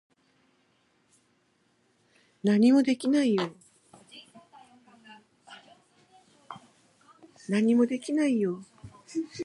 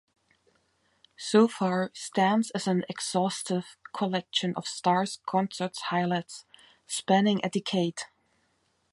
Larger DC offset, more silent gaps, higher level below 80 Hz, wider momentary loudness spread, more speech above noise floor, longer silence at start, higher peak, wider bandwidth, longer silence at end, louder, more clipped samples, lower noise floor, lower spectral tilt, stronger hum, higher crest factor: neither; neither; about the same, -76 dBFS vs -76 dBFS; first, 28 LU vs 10 LU; about the same, 45 dB vs 44 dB; first, 2.45 s vs 1.2 s; about the same, -12 dBFS vs -10 dBFS; about the same, 11.5 kHz vs 11.5 kHz; second, 0 s vs 0.85 s; about the same, -26 LUFS vs -28 LUFS; neither; about the same, -69 dBFS vs -72 dBFS; first, -6 dB/octave vs -4.5 dB/octave; neither; about the same, 18 dB vs 20 dB